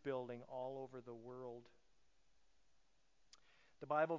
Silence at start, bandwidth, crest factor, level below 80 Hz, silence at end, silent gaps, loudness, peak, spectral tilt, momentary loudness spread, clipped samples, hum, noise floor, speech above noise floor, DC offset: 0.05 s; 7.2 kHz; 22 dB; -84 dBFS; 0 s; none; -48 LUFS; -26 dBFS; -5 dB/octave; 24 LU; under 0.1%; none; -81 dBFS; 36 dB; under 0.1%